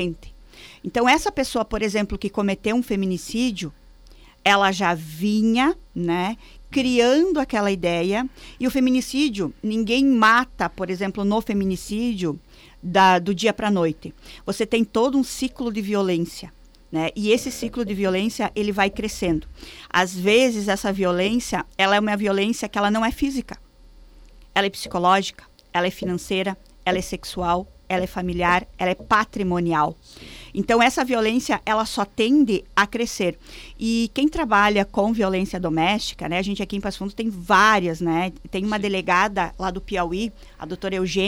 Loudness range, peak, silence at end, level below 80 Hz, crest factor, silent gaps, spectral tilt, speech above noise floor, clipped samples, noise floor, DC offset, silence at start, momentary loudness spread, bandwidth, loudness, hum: 3 LU; -6 dBFS; 0 s; -44 dBFS; 16 dB; none; -4.5 dB/octave; 26 dB; under 0.1%; -48 dBFS; under 0.1%; 0 s; 11 LU; 17.5 kHz; -22 LUFS; none